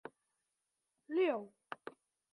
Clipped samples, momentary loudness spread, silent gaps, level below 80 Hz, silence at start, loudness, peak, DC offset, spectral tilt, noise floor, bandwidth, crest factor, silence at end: under 0.1%; 20 LU; none; under -90 dBFS; 0.05 s; -37 LUFS; -24 dBFS; under 0.1%; -6 dB/octave; -87 dBFS; 10.5 kHz; 18 dB; 0.45 s